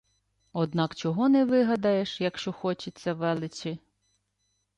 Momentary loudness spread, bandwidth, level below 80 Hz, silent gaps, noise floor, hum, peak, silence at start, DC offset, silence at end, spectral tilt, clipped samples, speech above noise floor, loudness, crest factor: 13 LU; 9.2 kHz; -68 dBFS; none; -76 dBFS; 50 Hz at -55 dBFS; -14 dBFS; 0.55 s; under 0.1%; 1 s; -6.5 dB/octave; under 0.1%; 49 dB; -27 LUFS; 14 dB